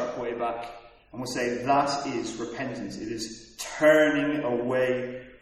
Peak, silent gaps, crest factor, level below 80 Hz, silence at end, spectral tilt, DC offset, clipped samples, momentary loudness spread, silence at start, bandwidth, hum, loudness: -10 dBFS; none; 18 dB; -58 dBFS; 0.05 s; -4.5 dB/octave; under 0.1%; under 0.1%; 16 LU; 0 s; 14 kHz; none; -26 LUFS